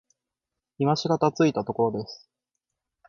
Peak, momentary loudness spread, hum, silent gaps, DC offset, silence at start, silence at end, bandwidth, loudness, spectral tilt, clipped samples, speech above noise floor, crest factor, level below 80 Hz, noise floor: -8 dBFS; 15 LU; none; none; under 0.1%; 0.8 s; 0.95 s; 7.2 kHz; -25 LUFS; -6.5 dB/octave; under 0.1%; 63 dB; 20 dB; -64 dBFS; -87 dBFS